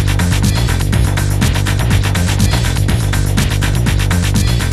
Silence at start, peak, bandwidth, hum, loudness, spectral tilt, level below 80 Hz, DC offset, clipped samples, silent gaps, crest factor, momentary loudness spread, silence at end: 0 s; 0 dBFS; 14.5 kHz; none; -14 LUFS; -5 dB/octave; -18 dBFS; under 0.1%; under 0.1%; none; 12 dB; 1 LU; 0 s